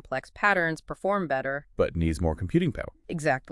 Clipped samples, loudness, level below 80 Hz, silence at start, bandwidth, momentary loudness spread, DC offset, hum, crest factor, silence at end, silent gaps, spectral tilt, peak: under 0.1%; -27 LUFS; -44 dBFS; 0.05 s; 12 kHz; 9 LU; under 0.1%; none; 20 dB; 0 s; none; -6.5 dB/octave; -8 dBFS